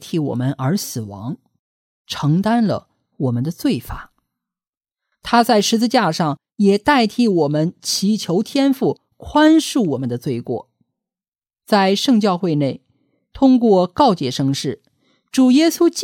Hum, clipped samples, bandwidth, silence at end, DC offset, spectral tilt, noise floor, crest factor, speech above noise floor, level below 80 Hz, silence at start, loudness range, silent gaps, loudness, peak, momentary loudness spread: none; under 0.1%; 17 kHz; 0 s; under 0.1%; -5.5 dB/octave; under -90 dBFS; 16 dB; over 74 dB; -50 dBFS; 0 s; 5 LU; 1.59-2.05 s, 4.77-4.81 s, 11.28-11.32 s; -17 LUFS; -2 dBFS; 14 LU